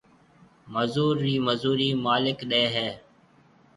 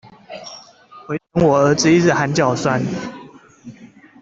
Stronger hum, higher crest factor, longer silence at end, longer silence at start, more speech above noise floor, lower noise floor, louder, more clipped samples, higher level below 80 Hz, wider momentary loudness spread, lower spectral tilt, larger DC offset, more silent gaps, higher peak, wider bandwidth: neither; about the same, 18 dB vs 18 dB; first, 0.8 s vs 0.35 s; first, 0.65 s vs 0.3 s; first, 33 dB vs 28 dB; first, -58 dBFS vs -44 dBFS; second, -25 LUFS vs -16 LUFS; neither; second, -64 dBFS vs -50 dBFS; second, 8 LU vs 23 LU; about the same, -6.5 dB/octave vs -5.5 dB/octave; neither; neither; second, -10 dBFS vs -2 dBFS; first, 11.5 kHz vs 7.8 kHz